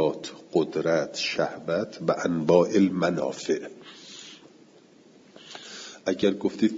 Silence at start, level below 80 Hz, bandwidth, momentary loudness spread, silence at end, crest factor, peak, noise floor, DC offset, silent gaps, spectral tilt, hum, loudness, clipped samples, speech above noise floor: 0 s; -68 dBFS; 7.8 kHz; 21 LU; 0 s; 20 dB; -6 dBFS; -55 dBFS; under 0.1%; none; -5.5 dB/octave; none; -26 LUFS; under 0.1%; 30 dB